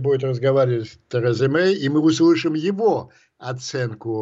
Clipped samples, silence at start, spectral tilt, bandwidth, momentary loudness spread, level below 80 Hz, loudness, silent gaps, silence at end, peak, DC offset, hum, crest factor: under 0.1%; 0 s; -6.5 dB/octave; 7.8 kHz; 10 LU; -66 dBFS; -20 LUFS; none; 0 s; -8 dBFS; under 0.1%; none; 12 dB